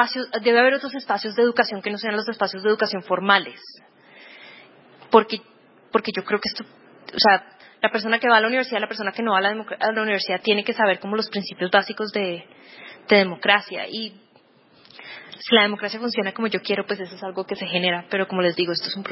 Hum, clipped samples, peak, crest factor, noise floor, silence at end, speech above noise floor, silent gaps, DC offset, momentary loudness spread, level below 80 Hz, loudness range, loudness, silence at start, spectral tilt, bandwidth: none; under 0.1%; 0 dBFS; 22 dB; -56 dBFS; 0 s; 34 dB; none; under 0.1%; 14 LU; -72 dBFS; 3 LU; -21 LUFS; 0 s; -7.5 dB/octave; 5.8 kHz